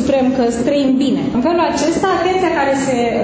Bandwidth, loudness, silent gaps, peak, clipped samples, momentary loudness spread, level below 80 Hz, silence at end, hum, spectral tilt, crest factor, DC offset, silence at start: 8 kHz; -15 LUFS; none; -2 dBFS; under 0.1%; 2 LU; -42 dBFS; 0 s; none; -5 dB/octave; 12 dB; under 0.1%; 0 s